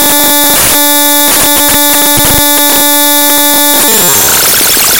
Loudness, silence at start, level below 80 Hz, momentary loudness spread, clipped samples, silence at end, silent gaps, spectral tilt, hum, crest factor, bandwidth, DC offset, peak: -3 LUFS; 0 s; -32 dBFS; 0 LU; 4%; 0 s; none; -1 dB/octave; none; 6 dB; over 20 kHz; 7%; 0 dBFS